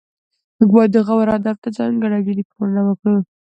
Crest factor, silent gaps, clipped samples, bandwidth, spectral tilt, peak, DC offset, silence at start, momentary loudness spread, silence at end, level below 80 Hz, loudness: 16 dB; 1.58-1.62 s, 2.45-2.50 s; under 0.1%; 7.8 kHz; -9.5 dB/octave; 0 dBFS; under 0.1%; 0.6 s; 9 LU; 0.2 s; -56 dBFS; -17 LUFS